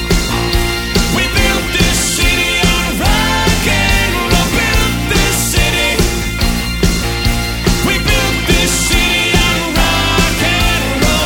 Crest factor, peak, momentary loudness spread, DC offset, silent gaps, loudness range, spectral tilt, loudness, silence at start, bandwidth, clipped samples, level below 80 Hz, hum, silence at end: 12 dB; 0 dBFS; 4 LU; under 0.1%; none; 2 LU; -3.5 dB/octave; -12 LUFS; 0 s; 17.5 kHz; under 0.1%; -18 dBFS; none; 0 s